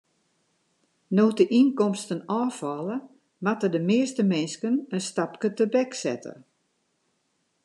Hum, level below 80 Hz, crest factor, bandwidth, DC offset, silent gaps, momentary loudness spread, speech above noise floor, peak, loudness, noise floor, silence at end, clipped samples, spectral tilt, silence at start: none; -82 dBFS; 18 dB; 11.5 kHz; under 0.1%; none; 11 LU; 49 dB; -8 dBFS; -25 LUFS; -73 dBFS; 1.3 s; under 0.1%; -6 dB/octave; 1.1 s